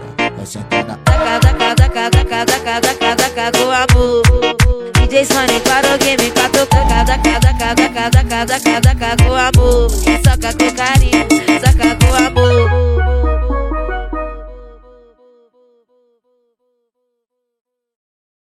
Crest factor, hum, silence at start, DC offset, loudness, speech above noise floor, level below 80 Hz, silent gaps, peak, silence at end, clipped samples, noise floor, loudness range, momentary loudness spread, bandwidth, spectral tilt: 12 dB; none; 0 s; under 0.1%; -12 LUFS; 61 dB; -18 dBFS; none; 0 dBFS; 3.65 s; 0.1%; -72 dBFS; 7 LU; 7 LU; 16 kHz; -4.5 dB/octave